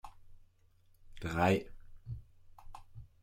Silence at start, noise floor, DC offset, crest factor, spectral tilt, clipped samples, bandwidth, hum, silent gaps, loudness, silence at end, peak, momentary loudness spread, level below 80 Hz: 0.05 s; -66 dBFS; under 0.1%; 22 dB; -6.5 dB/octave; under 0.1%; 16.5 kHz; none; none; -33 LUFS; 0.15 s; -16 dBFS; 26 LU; -56 dBFS